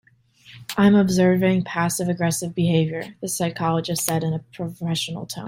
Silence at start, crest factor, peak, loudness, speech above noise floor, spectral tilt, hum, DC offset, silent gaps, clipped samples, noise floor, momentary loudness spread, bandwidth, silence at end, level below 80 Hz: 0.5 s; 22 dB; 0 dBFS; -22 LUFS; 31 dB; -5.5 dB/octave; none; under 0.1%; none; under 0.1%; -52 dBFS; 12 LU; 16.5 kHz; 0 s; -56 dBFS